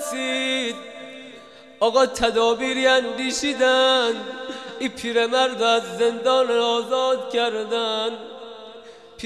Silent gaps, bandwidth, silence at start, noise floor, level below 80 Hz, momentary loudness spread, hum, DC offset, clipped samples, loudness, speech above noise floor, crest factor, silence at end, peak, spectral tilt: none; 13.5 kHz; 0 s; -44 dBFS; -56 dBFS; 19 LU; none; under 0.1%; under 0.1%; -21 LUFS; 24 dB; 16 dB; 0 s; -6 dBFS; -2 dB/octave